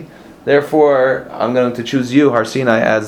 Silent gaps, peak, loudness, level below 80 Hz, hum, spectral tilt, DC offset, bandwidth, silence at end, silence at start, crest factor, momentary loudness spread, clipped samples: none; 0 dBFS; -14 LUFS; -54 dBFS; none; -6 dB/octave; under 0.1%; 15.5 kHz; 0 s; 0 s; 14 dB; 7 LU; under 0.1%